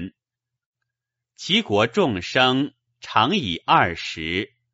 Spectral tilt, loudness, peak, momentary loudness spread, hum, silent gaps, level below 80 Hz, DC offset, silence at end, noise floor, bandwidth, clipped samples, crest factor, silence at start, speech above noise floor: -2.5 dB/octave; -21 LUFS; -2 dBFS; 10 LU; none; 0.66-0.73 s; -54 dBFS; under 0.1%; 0.3 s; -86 dBFS; 8 kHz; under 0.1%; 22 dB; 0 s; 65 dB